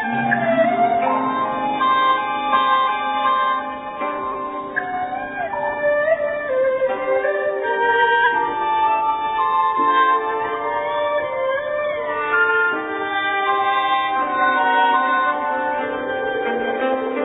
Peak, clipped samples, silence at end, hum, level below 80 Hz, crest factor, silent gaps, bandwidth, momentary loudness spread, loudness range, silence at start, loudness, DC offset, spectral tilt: -4 dBFS; under 0.1%; 0 s; none; -58 dBFS; 16 dB; none; 4 kHz; 8 LU; 4 LU; 0 s; -19 LUFS; under 0.1%; -9 dB/octave